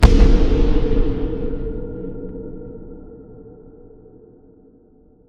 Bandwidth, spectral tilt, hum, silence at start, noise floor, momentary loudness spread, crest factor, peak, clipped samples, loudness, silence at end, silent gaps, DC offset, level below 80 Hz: 9.6 kHz; -7.5 dB/octave; none; 0 s; -51 dBFS; 25 LU; 18 dB; 0 dBFS; 0.1%; -21 LUFS; 1.95 s; none; under 0.1%; -20 dBFS